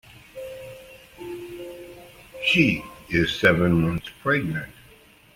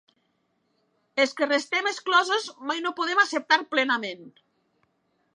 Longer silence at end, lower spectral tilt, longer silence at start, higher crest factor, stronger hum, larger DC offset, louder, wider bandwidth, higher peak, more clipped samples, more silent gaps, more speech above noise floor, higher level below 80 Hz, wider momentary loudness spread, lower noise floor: second, 0.65 s vs 1.05 s; first, -6 dB/octave vs -1.5 dB/octave; second, 0.15 s vs 1.15 s; about the same, 22 dB vs 20 dB; neither; neither; about the same, -22 LUFS vs -24 LUFS; first, 16.5 kHz vs 11.5 kHz; first, -2 dBFS vs -6 dBFS; neither; neither; second, 31 dB vs 47 dB; first, -48 dBFS vs -86 dBFS; first, 23 LU vs 9 LU; second, -52 dBFS vs -72 dBFS